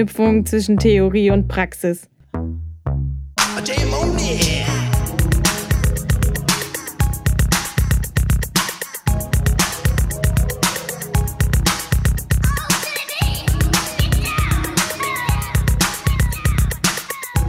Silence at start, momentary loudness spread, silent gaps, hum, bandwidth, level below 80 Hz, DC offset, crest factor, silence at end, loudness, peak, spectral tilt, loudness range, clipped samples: 0 s; 7 LU; none; none; 16.5 kHz; -22 dBFS; under 0.1%; 16 dB; 0 s; -19 LUFS; -2 dBFS; -4.5 dB/octave; 1 LU; under 0.1%